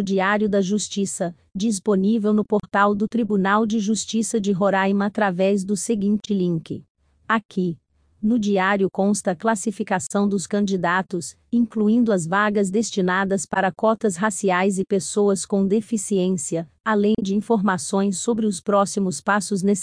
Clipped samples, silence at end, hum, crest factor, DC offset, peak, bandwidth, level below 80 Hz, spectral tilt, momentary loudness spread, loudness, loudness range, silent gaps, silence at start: under 0.1%; 0 s; none; 16 dB; under 0.1%; -6 dBFS; 10.5 kHz; -60 dBFS; -5 dB/octave; 5 LU; -21 LUFS; 2 LU; 6.90-6.95 s, 7.45-7.49 s, 16.80-16.84 s; 0 s